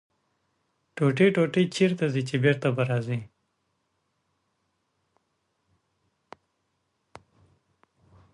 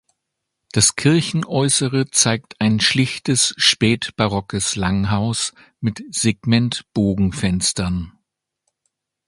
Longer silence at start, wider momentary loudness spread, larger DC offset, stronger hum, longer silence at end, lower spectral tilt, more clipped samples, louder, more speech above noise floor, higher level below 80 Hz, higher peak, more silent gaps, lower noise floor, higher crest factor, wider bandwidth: first, 0.95 s vs 0.75 s; about the same, 10 LU vs 9 LU; neither; neither; first, 5.1 s vs 1.2 s; first, -7 dB/octave vs -3.5 dB/octave; neither; second, -25 LUFS vs -18 LUFS; second, 52 dB vs 60 dB; second, -70 dBFS vs -42 dBFS; second, -8 dBFS vs 0 dBFS; neither; about the same, -76 dBFS vs -78 dBFS; about the same, 22 dB vs 20 dB; about the same, 11.5 kHz vs 11.5 kHz